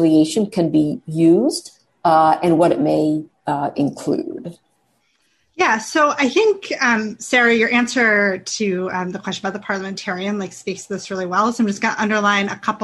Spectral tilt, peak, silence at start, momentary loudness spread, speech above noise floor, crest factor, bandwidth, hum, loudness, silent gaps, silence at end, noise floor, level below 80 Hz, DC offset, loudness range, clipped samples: -4.5 dB/octave; -4 dBFS; 0 s; 11 LU; 46 dB; 14 dB; 12.5 kHz; none; -18 LUFS; none; 0 s; -64 dBFS; -60 dBFS; under 0.1%; 6 LU; under 0.1%